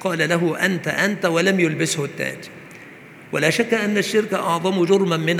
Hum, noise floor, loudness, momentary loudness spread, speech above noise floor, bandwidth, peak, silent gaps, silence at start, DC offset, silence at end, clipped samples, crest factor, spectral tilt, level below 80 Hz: none; -42 dBFS; -20 LUFS; 12 LU; 22 dB; 20 kHz; -2 dBFS; none; 0 s; under 0.1%; 0 s; under 0.1%; 18 dB; -4.5 dB/octave; -68 dBFS